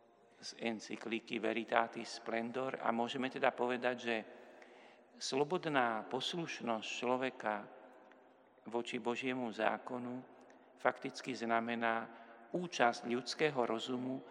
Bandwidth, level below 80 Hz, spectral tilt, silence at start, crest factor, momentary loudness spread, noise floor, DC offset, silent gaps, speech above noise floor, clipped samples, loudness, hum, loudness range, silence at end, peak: 11 kHz; under -90 dBFS; -4 dB/octave; 0.4 s; 26 dB; 13 LU; -65 dBFS; under 0.1%; none; 27 dB; under 0.1%; -38 LUFS; none; 3 LU; 0 s; -14 dBFS